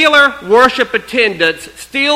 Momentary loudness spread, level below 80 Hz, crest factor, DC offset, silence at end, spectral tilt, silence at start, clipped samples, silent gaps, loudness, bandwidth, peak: 8 LU; -46 dBFS; 12 dB; under 0.1%; 0 s; -2.5 dB/octave; 0 s; 0.3%; none; -11 LUFS; 16 kHz; 0 dBFS